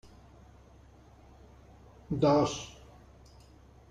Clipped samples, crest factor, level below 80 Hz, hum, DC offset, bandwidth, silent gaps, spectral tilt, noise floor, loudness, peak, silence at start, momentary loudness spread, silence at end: under 0.1%; 22 dB; -56 dBFS; none; under 0.1%; 11 kHz; none; -6 dB/octave; -56 dBFS; -29 LUFS; -14 dBFS; 2.1 s; 22 LU; 1.2 s